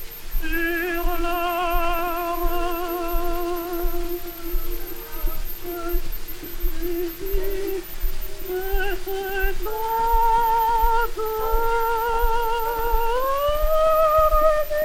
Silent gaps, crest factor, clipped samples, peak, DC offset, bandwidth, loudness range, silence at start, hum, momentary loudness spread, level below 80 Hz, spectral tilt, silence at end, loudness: none; 16 dB; under 0.1%; -6 dBFS; under 0.1%; 16.5 kHz; 9 LU; 0 s; none; 13 LU; -26 dBFS; -5 dB/octave; 0 s; -24 LUFS